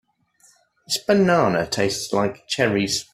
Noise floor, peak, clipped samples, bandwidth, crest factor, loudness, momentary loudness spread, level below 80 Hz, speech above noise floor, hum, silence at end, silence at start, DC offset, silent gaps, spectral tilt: -58 dBFS; -4 dBFS; under 0.1%; 15 kHz; 18 dB; -21 LUFS; 7 LU; -56 dBFS; 38 dB; none; 0.1 s; 0.9 s; under 0.1%; none; -4 dB/octave